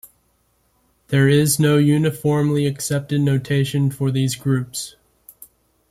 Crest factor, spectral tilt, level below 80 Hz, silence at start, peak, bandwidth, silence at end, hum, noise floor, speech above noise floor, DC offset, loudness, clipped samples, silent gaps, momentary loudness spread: 16 dB; -6 dB/octave; -54 dBFS; 1.1 s; -4 dBFS; 15 kHz; 1 s; none; -63 dBFS; 46 dB; under 0.1%; -19 LUFS; under 0.1%; none; 7 LU